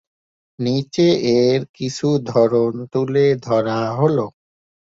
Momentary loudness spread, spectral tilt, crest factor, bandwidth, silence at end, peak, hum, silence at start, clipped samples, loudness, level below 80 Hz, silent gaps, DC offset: 7 LU; -6.5 dB/octave; 16 dB; 7.8 kHz; 0.55 s; -2 dBFS; none; 0.6 s; under 0.1%; -18 LUFS; -58 dBFS; 1.69-1.74 s; under 0.1%